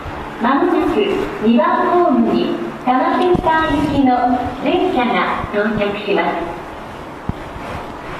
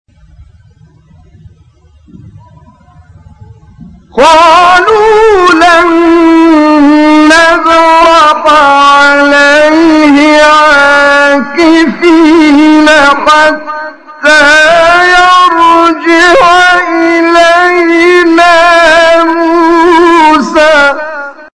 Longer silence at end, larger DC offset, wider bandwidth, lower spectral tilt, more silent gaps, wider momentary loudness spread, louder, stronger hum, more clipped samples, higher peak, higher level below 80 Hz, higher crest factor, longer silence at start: about the same, 0 s vs 0.1 s; neither; first, 13.5 kHz vs 11 kHz; first, -6.5 dB/octave vs -3 dB/octave; neither; first, 14 LU vs 4 LU; second, -16 LUFS vs -3 LUFS; neither; second, under 0.1% vs 6%; second, -4 dBFS vs 0 dBFS; about the same, -38 dBFS vs -36 dBFS; first, 12 dB vs 4 dB; second, 0 s vs 2.25 s